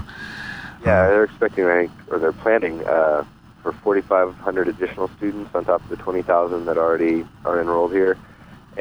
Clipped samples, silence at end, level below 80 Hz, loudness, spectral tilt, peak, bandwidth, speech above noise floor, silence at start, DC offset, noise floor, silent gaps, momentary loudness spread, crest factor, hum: under 0.1%; 0 s; -48 dBFS; -20 LUFS; -8 dB/octave; -4 dBFS; 19.5 kHz; 22 dB; 0 s; under 0.1%; -41 dBFS; none; 12 LU; 16 dB; none